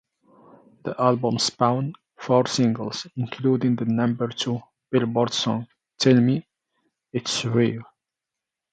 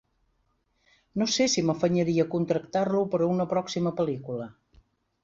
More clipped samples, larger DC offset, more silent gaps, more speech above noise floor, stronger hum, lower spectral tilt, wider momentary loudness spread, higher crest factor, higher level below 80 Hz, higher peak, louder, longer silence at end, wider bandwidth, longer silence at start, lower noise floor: neither; neither; neither; first, 64 dB vs 46 dB; neither; about the same, -5.5 dB/octave vs -5 dB/octave; about the same, 13 LU vs 11 LU; about the same, 18 dB vs 16 dB; about the same, -66 dBFS vs -62 dBFS; first, -6 dBFS vs -12 dBFS; first, -23 LUFS vs -27 LUFS; first, 0.9 s vs 0.7 s; first, 9.2 kHz vs 8 kHz; second, 0.85 s vs 1.15 s; first, -86 dBFS vs -72 dBFS